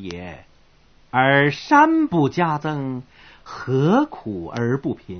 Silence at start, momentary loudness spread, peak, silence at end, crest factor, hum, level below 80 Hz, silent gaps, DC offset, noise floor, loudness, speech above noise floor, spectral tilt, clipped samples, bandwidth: 0 s; 18 LU; -2 dBFS; 0 s; 18 dB; none; -52 dBFS; none; under 0.1%; -53 dBFS; -19 LUFS; 33 dB; -7 dB/octave; under 0.1%; 6.6 kHz